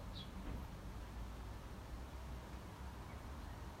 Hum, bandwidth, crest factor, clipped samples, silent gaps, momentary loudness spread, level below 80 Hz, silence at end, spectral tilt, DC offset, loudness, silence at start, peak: none; 16 kHz; 14 dB; under 0.1%; none; 3 LU; -52 dBFS; 0 s; -5.5 dB/octave; under 0.1%; -52 LUFS; 0 s; -36 dBFS